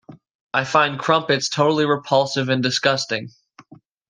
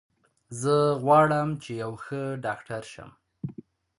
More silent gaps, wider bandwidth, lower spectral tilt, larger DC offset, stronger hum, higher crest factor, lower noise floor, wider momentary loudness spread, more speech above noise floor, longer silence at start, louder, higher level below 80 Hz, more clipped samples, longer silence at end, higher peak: first, 0.35-0.50 s vs none; second, 10 kHz vs 11.5 kHz; second, -4 dB/octave vs -6.5 dB/octave; neither; neither; about the same, 20 dB vs 20 dB; about the same, -48 dBFS vs -48 dBFS; second, 7 LU vs 20 LU; first, 29 dB vs 22 dB; second, 0.1 s vs 0.5 s; first, -19 LUFS vs -26 LUFS; about the same, -66 dBFS vs -62 dBFS; neither; first, 0.8 s vs 0.45 s; first, -2 dBFS vs -8 dBFS